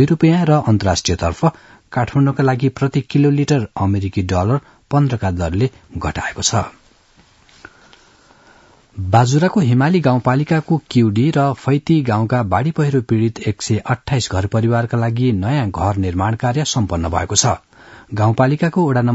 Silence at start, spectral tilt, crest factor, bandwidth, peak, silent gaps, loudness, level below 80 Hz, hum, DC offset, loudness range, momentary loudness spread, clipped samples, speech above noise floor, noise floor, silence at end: 0 s; -6 dB/octave; 16 dB; 8 kHz; 0 dBFS; none; -17 LUFS; -44 dBFS; none; under 0.1%; 5 LU; 6 LU; under 0.1%; 36 dB; -51 dBFS; 0 s